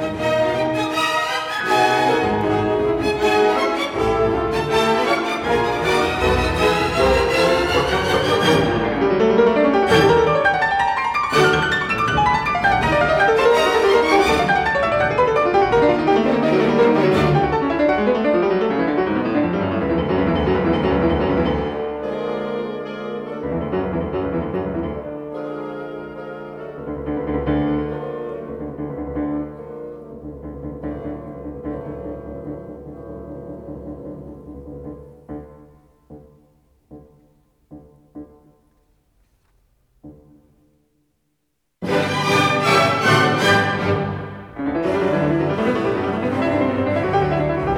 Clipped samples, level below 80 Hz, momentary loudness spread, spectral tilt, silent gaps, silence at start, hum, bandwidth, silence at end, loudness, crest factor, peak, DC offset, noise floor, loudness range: under 0.1%; -38 dBFS; 18 LU; -5.5 dB/octave; none; 0 s; none; 16.5 kHz; 0 s; -18 LUFS; 18 dB; -2 dBFS; under 0.1%; -73 dBFS; 15 LU